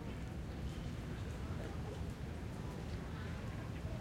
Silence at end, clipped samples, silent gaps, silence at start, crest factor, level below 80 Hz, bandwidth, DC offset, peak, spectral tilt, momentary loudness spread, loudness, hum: 0 s; under 0.1%; none; 0 s; 12 dB; -50 dBFS; 16.5 kHz; under 0.1%; -32 dBFS; -6.5 dB/octave; 2 LU; -45 LUFS; none